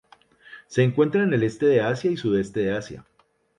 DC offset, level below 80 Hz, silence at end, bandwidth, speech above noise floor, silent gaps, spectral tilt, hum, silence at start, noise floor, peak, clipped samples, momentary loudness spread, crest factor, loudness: under 0.1%; -58 dBFS; 0.6 s; 11 kHz; 31 dB; none; -7 dB/octave; none; 0.5 s; -52 dBFS; -8 dBFS; under 0.1%; 9 LU; 16 dB; -23 LUFS